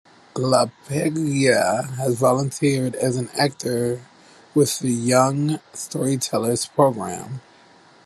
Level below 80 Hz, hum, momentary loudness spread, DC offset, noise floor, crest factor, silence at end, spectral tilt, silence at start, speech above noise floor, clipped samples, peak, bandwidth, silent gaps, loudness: -64 dBFS; none; 11 LU; under 0.1%; -51 dBFS; 20 dB; 0.65 s; -5 dB/octave; 0.35 s; 30 dB; under 0.1%; -2 dBFS; 13 kHz; none; -21 LUFS